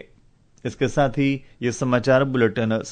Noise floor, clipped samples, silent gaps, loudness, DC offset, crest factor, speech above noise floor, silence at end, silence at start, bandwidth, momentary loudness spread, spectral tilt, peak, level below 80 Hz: -55 dBFS; under 0.1%; none; -21 LUFS; under 0.1%; 16 dB; 34 dB; 0 s; 0.65 s; 9.4 kHz; 9 LU; -6 dB/octave; -6 dBFS; -48 dBFS